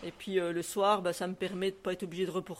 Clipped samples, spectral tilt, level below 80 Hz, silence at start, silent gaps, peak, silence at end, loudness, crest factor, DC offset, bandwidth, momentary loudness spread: under 0.1%; -4.5 dB/octave; -68 dBFS; 0 s; none; -14 dBFS; 0 s; -33 LUFS; 20 dB; under 0.1%; 16 kHz; 7 LU